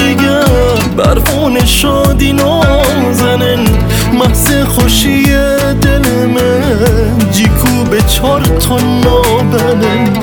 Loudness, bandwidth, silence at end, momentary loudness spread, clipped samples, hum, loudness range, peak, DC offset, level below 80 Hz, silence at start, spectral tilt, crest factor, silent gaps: -9 LUFS; over 20 kHz; 0 s; 2 LU; under 0.1%; none; 1 LU; 0 dBFS; under 0.1%; -16 dBFS; 0 s; -5 dB/octave; 8 dB; none